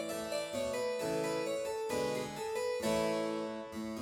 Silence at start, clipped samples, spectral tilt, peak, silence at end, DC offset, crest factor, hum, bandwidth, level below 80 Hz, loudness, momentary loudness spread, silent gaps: 0 s; under 0.1%; -4 dB/octave; -22 dBFS; 0 s; under 0.1%; 14 dB; none; 19 kHz; -64 dBFS; -36 LUFS; 6 LU; none